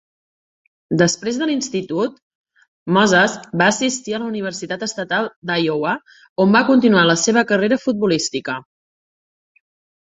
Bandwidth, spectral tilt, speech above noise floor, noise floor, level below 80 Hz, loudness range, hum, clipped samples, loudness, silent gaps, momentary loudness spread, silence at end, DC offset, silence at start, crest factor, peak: 8.2 kHz; -4 dB/octave; over 73 dB; under -90 dBFS; -60 dBFS; 3 LU; none; under 0.1%; -18 LUFS; 2.22-2.44 s, 2.68-2.86 s, 5.36-5.42 s, 6.29-6.36 s; 12 LU; 1.5 s; under 0.1%; 0.9 s; 18 dB; 0 dBFS